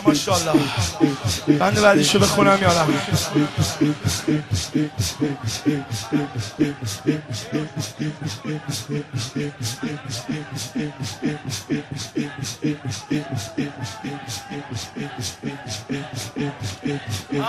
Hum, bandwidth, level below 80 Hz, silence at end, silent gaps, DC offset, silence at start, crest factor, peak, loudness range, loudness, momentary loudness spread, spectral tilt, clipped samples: none; 14 kHz; -48 dBFS; 0 s; none; under 0.1%; 0 s; 20 dB; -2 dBFS; 11 LU; -23 LUFS; 14 LU; -4.5 dB/octave; under 0.1%